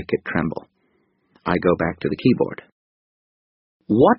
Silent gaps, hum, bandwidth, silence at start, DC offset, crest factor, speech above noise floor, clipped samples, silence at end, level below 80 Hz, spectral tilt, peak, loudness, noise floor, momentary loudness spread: 2.72-3.80 s; none; 5.6 kHz; 0 s; under 0.1%; 20 dB; 46 dB; under 0.1%; 0 s; -50 dBFS; -6 dB/octave; -2 dBFS; -22 LUFS; -66 dBFS; 12 LU